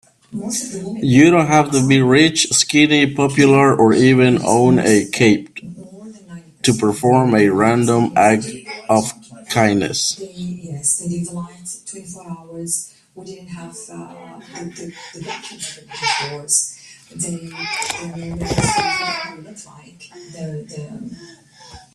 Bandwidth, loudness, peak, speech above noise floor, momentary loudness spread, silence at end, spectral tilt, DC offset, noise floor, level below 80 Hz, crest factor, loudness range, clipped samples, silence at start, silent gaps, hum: 13.5 kHz; -15 LUFS; 0 dBFS; 25 dB; 22 LU; 0.15 s; -4.5 dB/octave; under 0.1%; -42 dBFS; -50 dBFS; 18 dB; 16 LU; under 0.1%; 0.3 s; none; none